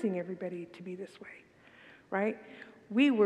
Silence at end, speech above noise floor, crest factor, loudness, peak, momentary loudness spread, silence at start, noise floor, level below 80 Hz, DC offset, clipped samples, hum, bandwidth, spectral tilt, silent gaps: 0 s; 25 dB; 18 dB; -35 LUFS; -14 dBFS; 24 LU; 0 s; -57 dBFS; -82 dBFS; under 0.1%; under 0.1%; none; 9.2 kHz; -7 dB/octave; none